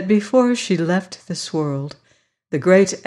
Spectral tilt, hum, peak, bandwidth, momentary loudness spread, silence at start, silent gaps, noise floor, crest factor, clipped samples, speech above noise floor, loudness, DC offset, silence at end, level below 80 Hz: -5.5 dB/octave; none; -4 dBFS; 11.5 kHz; 13 LU; 0 s; none; -61 dBFS; 16 dB; under 0.1%; 43 dB; -19 LUFS; under 0.1%; 0.05 s; -66 dBFS